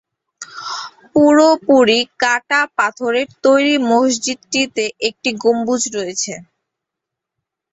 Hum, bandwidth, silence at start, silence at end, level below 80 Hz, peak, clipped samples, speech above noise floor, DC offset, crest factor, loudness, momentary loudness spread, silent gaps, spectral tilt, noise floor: none; 8.2 kHz; 0.4 s; 1.3 s; -62 dBFS; 0 dBFS; under 0.1%; 67 dB; under 0.1%; 16 dB; -15 LUFS; 14 LU; none; -2.5 dB/octave; -82 dBFS